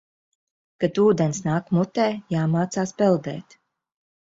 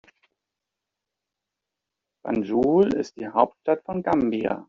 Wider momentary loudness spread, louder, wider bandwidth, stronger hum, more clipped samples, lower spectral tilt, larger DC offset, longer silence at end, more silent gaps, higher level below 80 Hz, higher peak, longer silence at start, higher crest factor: about the same, 7 LU vs 9 LU; about the same, -22 LUFS vs -23 LUFS; about the same, 7.8 kHz vs 7.2 kHz; neither; neither; about the same, -6.5 dB/octave vs -6.5 dB/octave; neither; first, 0.9 s vs 0.05 s; neither; about the same, -62 dBFS vs -58 dBFS; about the same, -6 dBFS vs -4 dBFS; second, 0.8 s vs 2.25 s; about the same, 18 dB vs 22 dB